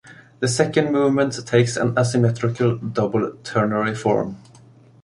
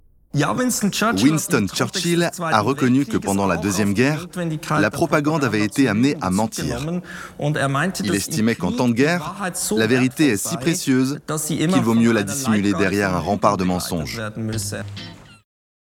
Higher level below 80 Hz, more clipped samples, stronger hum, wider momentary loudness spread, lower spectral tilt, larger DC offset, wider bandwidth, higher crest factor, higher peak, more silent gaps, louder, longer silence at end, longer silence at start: second, -56 dBFS vs -50 dBFS; neither; neither; second, 5 LU vs 9 LU; about the same, -6 dB/octave vs -5 dB/octave; neither; second, 11.5 kHz vs 18.5 kHz; about the same, 18 dB vs 18 dB; about the same, -2 dBFS vs -2 dBFS; neither; about the same, -20 LUFS vs -20 LUFS; about the same, 0.65 s vs 0.65 s; second, 0.05 s vs 0.35 s